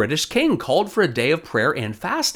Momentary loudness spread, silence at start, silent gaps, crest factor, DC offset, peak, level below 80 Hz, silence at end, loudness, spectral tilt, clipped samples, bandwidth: 3 LU; 0 s; none; 16 dB; under 0.1%; -6 dBFS; -54 dBFS; 0 s; -20 LUFS; -4 dB/octave; under 0.1%; 19.5 kHz